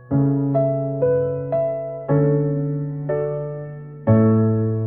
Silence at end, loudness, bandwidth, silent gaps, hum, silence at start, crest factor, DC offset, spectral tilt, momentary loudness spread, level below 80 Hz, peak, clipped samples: 0 s; -20 LUFS; 2.8 kHz; none; none; 0 s; 16 dB; 0.2%; -15 dB/octave; 10 LU; -56 dBFS; -4 dBFS; under 0.1%